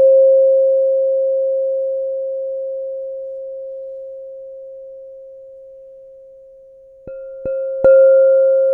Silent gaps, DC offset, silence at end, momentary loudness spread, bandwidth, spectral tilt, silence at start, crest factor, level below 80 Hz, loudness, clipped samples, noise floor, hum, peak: none; under 0.1%; 0 s; 24 LU; 1.5 kHz; -9 dB/octave; 0 s; 14 dB; -56 dBFS; -15 LUFS; under 0.1%; -43 dBFS; none; -2 dBFS